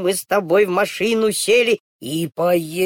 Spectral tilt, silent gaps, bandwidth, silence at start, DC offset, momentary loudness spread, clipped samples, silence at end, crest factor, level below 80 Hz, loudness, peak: -4 dB/octave; 1.80-1.99 s; 18.5 kHz; 0 s; under 0.1%; 8 LU; under 0.1%; 0 s; 12 dB; -62 dBFS; -18 LUFS; -6 dBFS